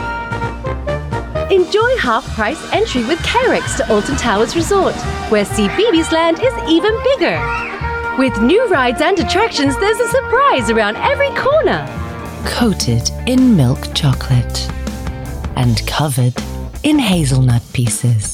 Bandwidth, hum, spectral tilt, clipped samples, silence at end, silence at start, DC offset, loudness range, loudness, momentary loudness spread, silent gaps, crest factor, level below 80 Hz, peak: 16 kHz; none; -5 dB/octave; under 0.1%; 0 s; 0 s; under 0.1%; 3 LU; -15 LUFS; 9 LU; none; 12 dB; -30 dBFS; -4 dBFS